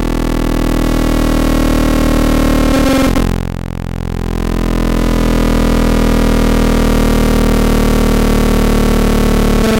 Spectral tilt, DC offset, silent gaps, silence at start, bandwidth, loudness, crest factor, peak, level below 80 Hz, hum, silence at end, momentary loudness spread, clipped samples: -6 dB/octave; under 0.1%; none; 0 s; 16.5 kHz; -13 LUFS; 8 dB; -2 dBFS; -14 dBFS; none; 0 s; 5 LU; under 0.1%